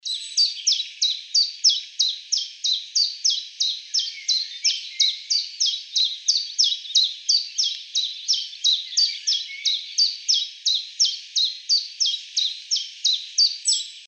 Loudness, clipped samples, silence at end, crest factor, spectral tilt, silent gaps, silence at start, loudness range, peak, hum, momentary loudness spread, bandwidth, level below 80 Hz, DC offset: -20 LUFS; under 0.1%; 0 s; 18 dB; 14 dB/octave; none; 0.05 s; 1 LU; -6 dBFS; none; 5 LU; 9.6 kHz; under -90 dBFS; under 0.1%